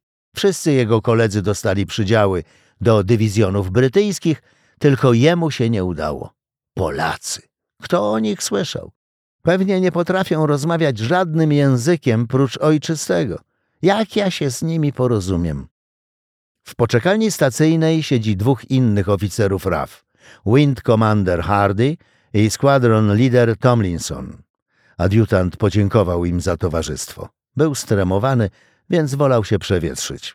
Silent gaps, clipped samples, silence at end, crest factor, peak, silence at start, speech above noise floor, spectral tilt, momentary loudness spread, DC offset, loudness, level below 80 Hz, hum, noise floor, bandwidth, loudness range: 8.96-9.39 s, 15.71-16.55 s, 24.50-24.54 s, 24.62-24.66 s; under 0.1%; 0.05 s; 16 dB; -2 dBFS; 0.35 s; over 73 dB; -6 dB/octave; 10 LU; under 0.1%; -17 LUFS; -44 dBFS; none; under -90 dBFS; 15.5 kHz; 4 LU